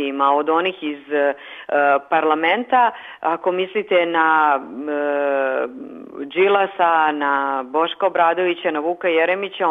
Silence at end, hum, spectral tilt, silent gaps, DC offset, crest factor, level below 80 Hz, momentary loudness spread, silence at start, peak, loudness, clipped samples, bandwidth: 0 s; none; -6 dB/octave; none; under 0.1%; 16 dB; -72 dBFS; 8 LU; 0 s; -4 dBFS; -19 LUFS; under 0.1%; 4 kHz